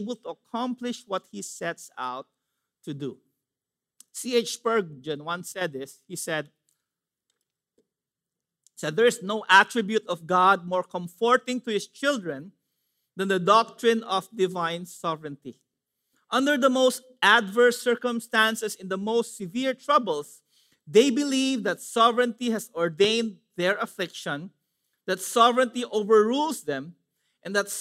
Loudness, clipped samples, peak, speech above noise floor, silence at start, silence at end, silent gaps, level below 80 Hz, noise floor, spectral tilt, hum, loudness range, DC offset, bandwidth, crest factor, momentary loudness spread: -25 LUFS; under 0.1%; -4 dBFS; 64 dB; 0 s; 0 s; none; -82 dBFS; -89 dBFS; -3.5 dB/octave; none; 11 LU; under 0.1%; 16 kHz; 22 dB; 15 LU